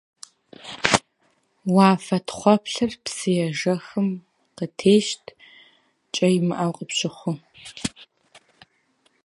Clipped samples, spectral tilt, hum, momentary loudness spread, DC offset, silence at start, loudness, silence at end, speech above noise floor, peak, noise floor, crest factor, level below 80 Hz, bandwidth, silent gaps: under 0.1%; -5 dB/octave; none; 15 LU; under 0.1%; 0.65 s; -22 LUFS; 1.35 s; 45 dB; 0 dBFS; -66 dBFS; 24 dB; -60 dBFS; 11.5 kHz; none